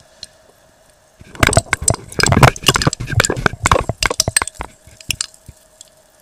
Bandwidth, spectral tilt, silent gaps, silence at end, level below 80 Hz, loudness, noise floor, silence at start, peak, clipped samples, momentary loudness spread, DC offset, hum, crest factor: 17.5 kHz; -3 dB/octave; none; 1 s; -30 dBFS; -15 LUFS; -51 dBFS; 1.35 s; 0 dBFS; 0.2%; 20 LU; under 0.1%; none; 18 dB